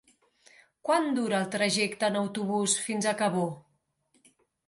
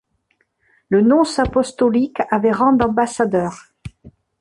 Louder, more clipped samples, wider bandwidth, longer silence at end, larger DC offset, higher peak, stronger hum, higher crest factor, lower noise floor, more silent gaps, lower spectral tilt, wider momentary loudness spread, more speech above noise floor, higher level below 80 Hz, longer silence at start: second, -28 LUFS vs -17 LUFS; neither; about the same, 11.5 kHz vs 11.5 kHz; first, 1.05 s vs 0.3 s; neither; second, -12 dBFS vs -2 dBFS; neither; about the same, 18 dB vs 16 dB; first, -73 dBFS vs -66 dBFS; neither; second, -3.5 dB/octave vs -6 dB/octave; second, 6 LU vs 12 LU; second, 45 dB vs 49 dB; second, -76 dBFS vs -42 dBFS; about the same, 0.85 s vs 0.9 s